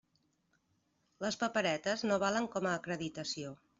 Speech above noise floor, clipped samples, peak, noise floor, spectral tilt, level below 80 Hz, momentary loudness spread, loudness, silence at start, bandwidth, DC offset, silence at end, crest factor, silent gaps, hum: 42 dB; under 0.1%; -18 dBFS; -77 dBFS; -4 dB/octave; -74 dBFS; 8 LU; -35 LUFS; 1.2 s; 8 kHz; under 0.1%; 0.25 s; 18 dB; none; none